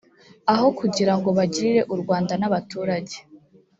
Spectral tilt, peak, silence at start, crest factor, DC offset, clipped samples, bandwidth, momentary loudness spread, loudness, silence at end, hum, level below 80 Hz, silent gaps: -6 dB/octave; -4 dBFS; 0.45 s; 18 dB; under 0.1%; under 0.1%; 8 kHz; 7 LU; -22 LUFS; 0.45 s; none; -62 dBFS; none